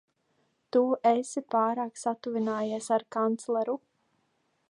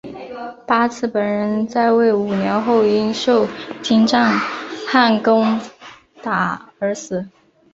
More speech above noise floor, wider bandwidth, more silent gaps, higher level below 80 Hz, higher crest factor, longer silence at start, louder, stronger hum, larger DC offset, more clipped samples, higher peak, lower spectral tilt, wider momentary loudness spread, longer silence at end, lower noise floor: first, 46 dB vs 25 dB; first, 11 kHz vs 7.8 kHz; neither; second, -82 dBFS vs -58 dBFS; about the same, 18 dB vs 16 dB; first, 0.75 s vs 0.05 s; second, -29 LUFS vs -17 LUFS; neither; neither; neither; second, -12 dBFS vs -2 dBFS; about the same, -5 dB/octave vs -5.5 dB/octave; second, 7 LU vs 13 LU; first, 0.95 s vs 0.45 s; first, -74 dBFS vs -42 dBFS